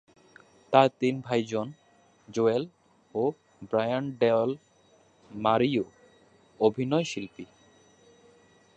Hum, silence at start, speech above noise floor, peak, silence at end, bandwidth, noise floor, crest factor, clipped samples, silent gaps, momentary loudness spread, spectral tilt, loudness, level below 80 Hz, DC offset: none; 0.7 s; 36 dB; -4 dBFS; 1.3 s; 8.8 kHz; -62 dBFS; 24 dB; under 0.1%; none; 17 LU; -6 dB/octave; -27 LUFS; -70 dBFS; under 0.1%